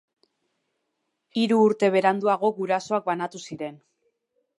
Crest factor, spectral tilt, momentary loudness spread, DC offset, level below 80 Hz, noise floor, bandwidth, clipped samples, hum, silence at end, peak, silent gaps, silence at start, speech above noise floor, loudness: 20 dB; -5.5 dB/octave; 15 LU; under 0.1%; -78 dBFS; -78 dBFS; 11.5 kHz; under 0.1%; none; 0.85 s; -6 dBFS; none; 1.35 s; 55 dB; -23 LUFS